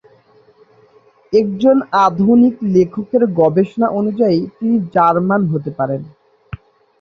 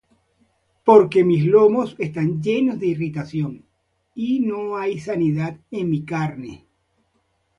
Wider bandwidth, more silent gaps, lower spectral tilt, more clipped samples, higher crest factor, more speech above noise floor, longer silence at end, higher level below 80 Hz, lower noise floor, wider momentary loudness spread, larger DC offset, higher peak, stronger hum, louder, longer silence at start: second, 6.4 kHz vs 9.4 kHz; neither; about the same, -9 dB/octave vs -8.5 dB/octave; neither; second, 14 dB vs 20 dB; second, 36 dB vs 50 dB; second, 0.9 s vs 1.05 s; first, -52 dBFS vs -60 dBFS; second, -50 dBFS vs -69 dBFS; second, 9 LU vs 14 LU; neither; about the same, -2 dBFS vs 0 dBFS; neither; first, -15 LUFS vs -20 LUFS; first, 1.3 s vs 0.85 s